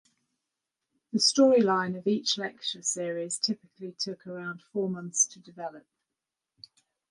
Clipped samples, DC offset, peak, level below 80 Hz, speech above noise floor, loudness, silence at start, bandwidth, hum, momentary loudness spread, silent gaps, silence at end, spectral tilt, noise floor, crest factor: under 0.1%; under 0.1%; -10 dBFS; -80 dBFS; 60 dB; -27 LUFS; 1.15 s; 11.5 kHz; none; 18 LU; none; 1.3 s; -3 dB/octave; -88 dBFS; 20 dB